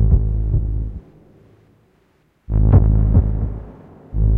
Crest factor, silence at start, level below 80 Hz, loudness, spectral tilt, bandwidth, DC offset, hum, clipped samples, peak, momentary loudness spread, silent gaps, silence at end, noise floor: 14 dB; 0 s; -20 dBFS; -18 LUFS; -13.5 dB/octave; 2 kHz; under 0.1%; none; under 0.1%; -2 dBFS; 18 LU; none; 0 s; -59 dBFS